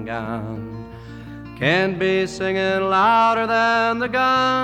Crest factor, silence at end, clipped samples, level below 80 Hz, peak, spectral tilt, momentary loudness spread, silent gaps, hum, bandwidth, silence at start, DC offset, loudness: 16 dB; 0 s; under 0.1%; -48 dBFS; -4 dBFS; -5.5 dB/octave; 20 LU; none; none; 13.5 kHz; 0 s; under 0.1%; -19 LUFS